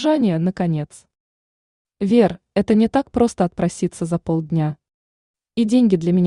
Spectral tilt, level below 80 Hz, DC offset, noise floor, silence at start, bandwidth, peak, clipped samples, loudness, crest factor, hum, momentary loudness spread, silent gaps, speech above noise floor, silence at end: -7.5 dB/octave; -50 dBFS; under 0.1%; under -90 dBFS; 0 s; 11 kHz; -4 dBFS; under 0.1%; -19 LUFS; 16 dB; none; 10 LU; 1.20-1.85 s, 4.94-5.34 s; over 72 dB; 0 s